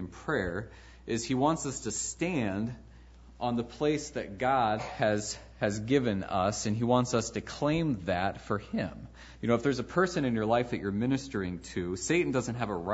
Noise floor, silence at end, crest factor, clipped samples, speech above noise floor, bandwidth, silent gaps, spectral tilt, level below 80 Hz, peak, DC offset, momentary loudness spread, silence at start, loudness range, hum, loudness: -52 dBFS; 0 s; 20 dB; under 0.1%; 22 dB; 8 kHz; none; -5 dB/octave; -52 dBFS; -12 dBFS; under 0.1%; 8 LU; 0 s; 3 LU; none; -31 LUFS